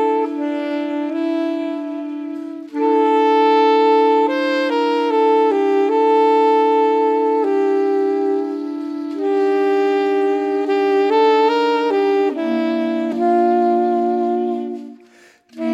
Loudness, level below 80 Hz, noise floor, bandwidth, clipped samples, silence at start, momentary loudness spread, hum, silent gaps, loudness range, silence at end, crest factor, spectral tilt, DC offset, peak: -17 LUFS; -82 dBFS; -49 dBFS; 8 kHz; under 0.1%; 0 s; 11 LU; none; none; 4 LU; 0 s; 12 dB; -5 dB/octave; under 0.1%; -4 dBFS